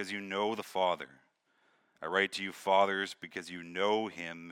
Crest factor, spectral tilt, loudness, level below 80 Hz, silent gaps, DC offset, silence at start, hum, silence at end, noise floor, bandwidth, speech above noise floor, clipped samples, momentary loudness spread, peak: 22 dB; -3.5 dB/octave; -33 LUFS; -86 dBFS; none; under 0.1%; 0 s; none; 0 s; -72 dBFS; 17 kHz; 39 dB; under 0.1%; 14 LU; -14 dBFS